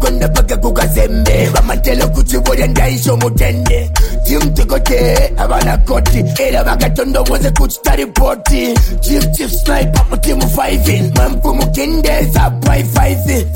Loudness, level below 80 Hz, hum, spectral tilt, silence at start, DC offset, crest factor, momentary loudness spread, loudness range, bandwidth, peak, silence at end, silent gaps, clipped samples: -13 LUFS; -12 dBFS; none; -5 dB/octave; 0 s; under 0.1%; 10 dB; 2 LU; 1 LU; 17 kHz; 0 dBFS; 0 s; none; under 0.1%